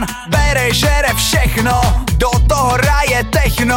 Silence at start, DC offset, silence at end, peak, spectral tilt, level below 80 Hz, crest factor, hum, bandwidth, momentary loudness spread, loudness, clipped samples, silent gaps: 0 s; under 0.1%; 0 s; -2 dBFS; -4 dB/octave; -18 dBFS; 12 dB; none; 17 kHz; 2 LU; -13 LUFS; under 0.1%; none